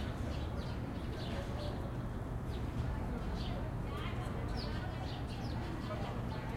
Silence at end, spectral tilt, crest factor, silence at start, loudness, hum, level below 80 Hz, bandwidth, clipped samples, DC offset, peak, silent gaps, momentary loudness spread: 0 s; -7 dB/octave; 14 dB; 0 s; -41 LUFS; none; -44 dBFS; 16 kHz; under 0.1%; under 0.1%; -26 dBFS; none; 2 LU